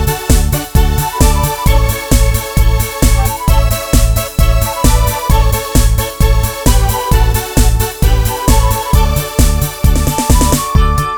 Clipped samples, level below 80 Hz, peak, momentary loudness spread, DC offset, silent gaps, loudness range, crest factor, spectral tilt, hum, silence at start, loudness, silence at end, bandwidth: 0.4%; -12 dBFS; 0 dBFS; 2 LU; under 0.1%; none; 0 LU; 10 dB; -4.5 dB/octave; none; 0 s; -13 LUFS; 0 s; over 20 kHz